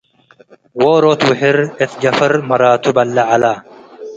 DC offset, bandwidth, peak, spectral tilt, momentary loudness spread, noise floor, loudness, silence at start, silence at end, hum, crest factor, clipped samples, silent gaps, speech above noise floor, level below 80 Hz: under 0.1%; 9 kHz; 0 dBFS; -5.5 dB/octave; 7 LU; -48 dBFS; -13 LUFS; 0.75 s; 0 s; none; 14 dB; under 0.1%; none; 36 dB; -56 dBFS